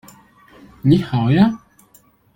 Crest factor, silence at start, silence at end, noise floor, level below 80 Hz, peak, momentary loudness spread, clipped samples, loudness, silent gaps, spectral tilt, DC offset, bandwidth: 18 dB; 0.85 s; 0.8 s; -53 dBFS; -48 dBFS; -2 dBFS; 7 LU; under 0.1%; -16 LUFS; none; -8.5 dB/octave; under 0.1%; 17 kHz